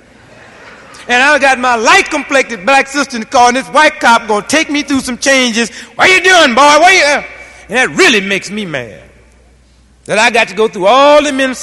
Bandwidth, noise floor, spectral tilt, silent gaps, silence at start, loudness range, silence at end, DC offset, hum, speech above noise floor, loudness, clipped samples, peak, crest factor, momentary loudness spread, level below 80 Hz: 13.5 kHz; -45 dBFS; -2 dB/octave; none; 0.65 s; 5 LU; 0 s; under 0.1%; none; 36 dB; -9 LUFS; 0.6%; 0 dBFS; 10 dB; 11 LU; -46 dBFS